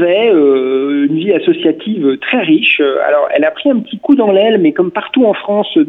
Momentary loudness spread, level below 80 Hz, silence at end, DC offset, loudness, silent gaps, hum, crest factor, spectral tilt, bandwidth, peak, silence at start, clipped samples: 6 LU; -60 dBFS; 0 s; under 0.1%; -11 LUFS; none; none; 10 dB; -8.5 dB/octave; 4 kHz; 0 dBFS; 0 s; under 0.1%